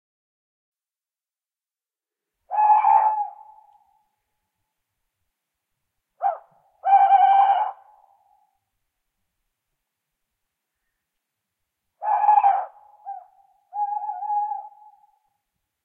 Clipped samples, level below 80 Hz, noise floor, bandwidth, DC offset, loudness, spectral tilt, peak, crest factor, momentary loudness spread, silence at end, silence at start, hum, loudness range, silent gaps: under 0.1%; -88 dBFS; under -90 dBFS; 3.3 kHz; under 0.1%; -20 LUFS; -1.5 dB/octave; -6 dBFS; 20 dB; 22 LU; 1.15 s; 2.5 s; none; 12 LU; none